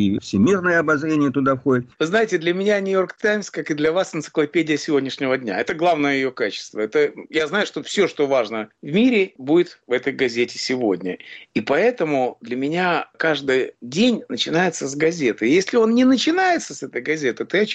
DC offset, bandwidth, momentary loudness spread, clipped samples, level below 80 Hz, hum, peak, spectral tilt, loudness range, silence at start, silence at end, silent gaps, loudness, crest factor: under 0.1%; 8.8 kHz; 7 LU; under 0.1%; -62 dBFS; none; -8 dBFS; -5 dB/octave; 3 LU; 0 s; 0 s; none; -20 LUFS; 12 dB